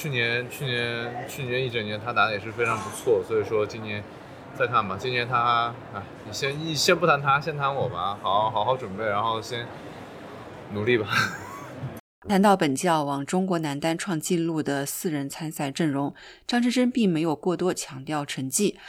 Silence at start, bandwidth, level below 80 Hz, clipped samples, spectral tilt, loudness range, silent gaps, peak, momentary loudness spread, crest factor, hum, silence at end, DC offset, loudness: 0 s; 19.5 kHz; -62 dBFS; under 0.1%; -4.5 dB/octave; 3 LU; 12.00-12.22 s; -6 dBFS; 15 LU; 20 dB; none; 0 s; under 0.1%; -25 LUFS